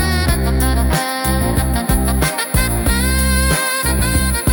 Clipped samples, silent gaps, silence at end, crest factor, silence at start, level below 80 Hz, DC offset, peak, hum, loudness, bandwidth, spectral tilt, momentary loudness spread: under 0.1%; none; 0 s; 14 dB; 0 s; -20 dBFS; under 0.1%; 0 dBFS; none; -16 LUFS; 19 kHz; -4 dB/octave; 2 LU